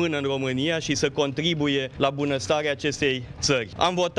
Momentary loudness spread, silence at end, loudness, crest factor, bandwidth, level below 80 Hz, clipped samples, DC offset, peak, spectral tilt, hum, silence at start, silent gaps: 3 LU; 0 s; -24 LUFS; 20 dB; 11.5 kHz; -52 dBFS; under 0.1%; under 0.1%; -4 dBFS; -4 dB/octave; none; 0 s; none